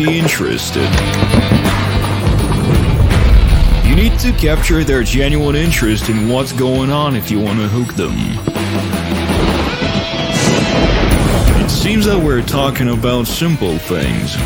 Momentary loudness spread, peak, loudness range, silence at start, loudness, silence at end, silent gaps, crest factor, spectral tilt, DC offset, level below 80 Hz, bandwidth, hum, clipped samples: 5 LU; 0 dBFS; 3 LU; 0 s; -14 LUFS; 0 s; none; 12 dB; -5.5 dB/octave; under 0.1%; -18 dBFS; 17 kHz; none; under 0.1%